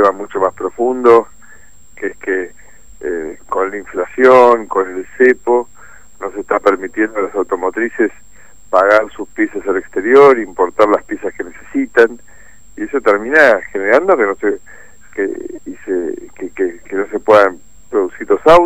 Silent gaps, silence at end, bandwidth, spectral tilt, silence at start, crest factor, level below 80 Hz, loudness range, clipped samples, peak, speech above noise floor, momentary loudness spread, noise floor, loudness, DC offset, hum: none; 0 s; 15.5 kHz; -5 dB/octave; 0 s; 14 dB; -48 dBFS; 4 LU; 0.3%; 0 dBFS; 31 dB; 16 LU; -44 dBFS; -14 LUFS; 2%; none